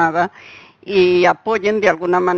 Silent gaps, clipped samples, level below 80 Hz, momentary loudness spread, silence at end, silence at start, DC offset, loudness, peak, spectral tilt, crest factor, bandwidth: none; under 0.1%; -54 dBFS; 7 LU; 0 s; 0 s; under 0.1%; -16 LUFS; 0 dBFS; -5.5 dB/octave; 16 dB; 7 kHz